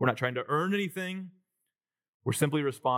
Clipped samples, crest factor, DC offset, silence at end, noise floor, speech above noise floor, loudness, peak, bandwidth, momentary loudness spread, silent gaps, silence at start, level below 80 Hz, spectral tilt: under 0.1%; 20 dB; under 0.1%; 0 s; -89 dBFS; 60 dB; -30 LUFS; -10 dBFS; 17 kHz; 10 LU; 2.09-2.20 s; 0 s; -86 dBFS; -5.5 dB/octave